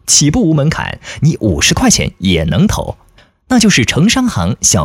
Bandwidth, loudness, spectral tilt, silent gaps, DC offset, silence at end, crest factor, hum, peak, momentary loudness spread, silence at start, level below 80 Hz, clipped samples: 16.5 kHz; -11 LUFS; -4 dB/octave; none; under 0.1%; 0 s; 12 dB; none; 0 dBFS; 7 LU; 0.05 s; -30 dBFS; under 0.1%